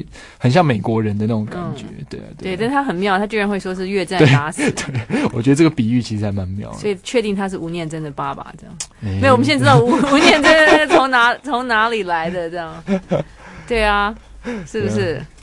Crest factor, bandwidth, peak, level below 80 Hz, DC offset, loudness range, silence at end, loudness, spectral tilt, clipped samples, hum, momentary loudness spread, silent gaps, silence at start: 16 dB; 11.5 kHz; 0 dBFS; -42 dBFS; under 0.1%; 8 LU; 0.15 s; -16 LUFS; -5.5 dB/octave; under 0.1%; none; 16 LU; none; 0 s